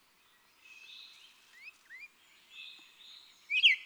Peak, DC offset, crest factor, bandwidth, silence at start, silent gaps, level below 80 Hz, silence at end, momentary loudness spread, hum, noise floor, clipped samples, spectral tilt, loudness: -14 dBFS; under 0.1%; 24 dB; over 20 kHz; 1.65 s; none; under -90 dBFS; 0.05 s; 25 LU; none; -67 dBFS; under 0.1%; 4 dB/octave; -26 LUFS